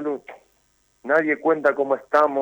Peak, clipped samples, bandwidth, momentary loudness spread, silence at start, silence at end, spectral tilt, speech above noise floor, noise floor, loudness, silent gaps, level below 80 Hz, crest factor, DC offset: -6 dBFS; under 0.1%; 19.5 kHz; 12 LU; 0 s; 0 s; -6.5 dB/octave; 45 dB; -65 dBFS; -21 LUFS; none; -72 dBFS; 16 dB; under 0.1%